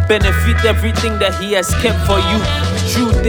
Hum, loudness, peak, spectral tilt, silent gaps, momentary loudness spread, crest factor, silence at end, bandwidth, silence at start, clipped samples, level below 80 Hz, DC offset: none; -14 LUFS; 0 dBFS; -5 dB/octave; none; 3 LU; 14 dB; 0 s; over 20 kHz; 0 s; under 0.1%; -20 dBFS; under 0.1%